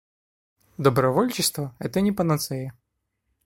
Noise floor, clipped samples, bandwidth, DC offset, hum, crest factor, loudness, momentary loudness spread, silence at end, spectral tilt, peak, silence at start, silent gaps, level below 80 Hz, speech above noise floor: -76 dBFS; under 0.1%; 16.5 kHz; under 0.1%; none; 22 dB; -24 LUFS; 10 LU; 0.75 s; -5 dB/octave; -4 dBFS; 0.8 s; none; -56 dBFS; 53 dB